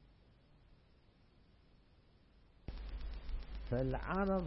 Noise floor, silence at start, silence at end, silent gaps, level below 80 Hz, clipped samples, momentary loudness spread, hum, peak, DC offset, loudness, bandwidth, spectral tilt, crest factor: -67 dBFS; 0 s; 0 s; none; -48 dBFS; under 0.1%; 15 LU; none; -24 dBFS; under 0.1%; -42 LUFS; 5.6 kHz; -7 dB/octave; 18 dB